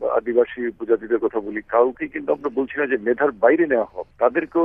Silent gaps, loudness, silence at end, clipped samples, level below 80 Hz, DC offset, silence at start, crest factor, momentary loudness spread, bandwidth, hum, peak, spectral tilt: none; -21 LUFS; 0 s; under 0.1%; -56 dBFS; under 0.1%; 0 s; 18 dB; 7 LU; 3.6 kHz; none; -2 dBFS; -9 dB/octave